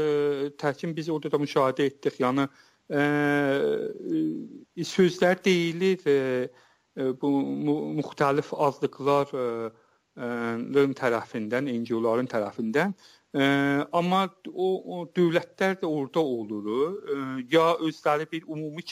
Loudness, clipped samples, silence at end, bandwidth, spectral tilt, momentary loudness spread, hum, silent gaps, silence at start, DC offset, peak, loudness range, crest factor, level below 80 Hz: -27 LUFS; under 0.1%; 0 s; 15.5 kHz; -6 dB/octave; 9 LU; none; none; 0 s; under 0.1%; -10 dBFS; 2 LU; 16 dB; -74 dBFS